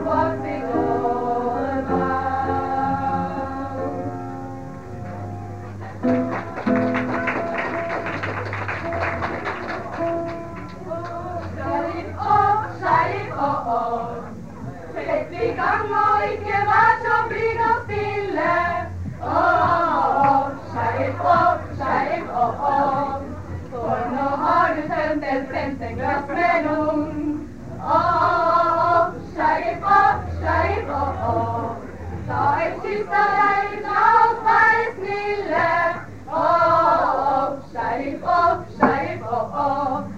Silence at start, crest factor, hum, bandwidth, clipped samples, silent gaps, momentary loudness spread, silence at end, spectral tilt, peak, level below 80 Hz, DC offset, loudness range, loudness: 0 s; 18 dB; none; 9.2 kHz; under 0.1%; none; 13 LU; 0 s; -7 dB/octave; -2 dBFS; -46 dBFS; 0.7%; 7 LU; -21 LUFS